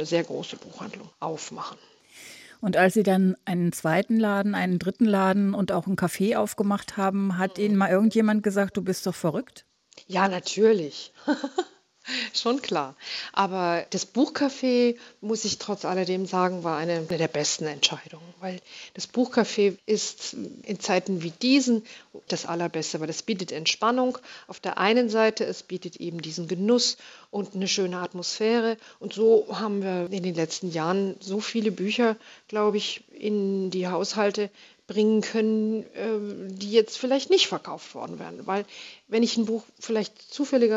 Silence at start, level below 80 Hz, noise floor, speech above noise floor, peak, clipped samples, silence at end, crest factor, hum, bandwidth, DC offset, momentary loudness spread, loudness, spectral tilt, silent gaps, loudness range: 0 s; -72 dBFS; -48 dBFS; 22 dB; -6 dBFS; under 0.1%; 0 s; 20 dB; none; 15.5 kHz; under 0.1%; 14 LU; -26 LUFS; -4.5 dB/octave; none; 3 LU